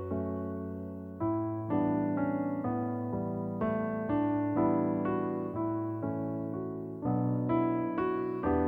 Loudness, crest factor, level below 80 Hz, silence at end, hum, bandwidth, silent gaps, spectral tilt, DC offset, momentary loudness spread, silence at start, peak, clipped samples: -33 LUFS; 16 dB; -58 dBFS; 0 s; none; 3.6 kHz; none; -11.5 dB/octave; under 0.1%; 7 LU; 0 s; -16 dBFS; under 0.1%